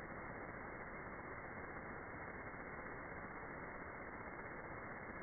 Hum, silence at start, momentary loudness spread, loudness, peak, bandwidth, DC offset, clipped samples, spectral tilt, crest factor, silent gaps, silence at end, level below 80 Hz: none; 0 s; 0 LU; -50 LUFS; -36 dBFS; 2.4 kHz; under 0.1%; under 0.1%; -1.5 dB/octave; 14 dB; none; 0 s; -64 dBFS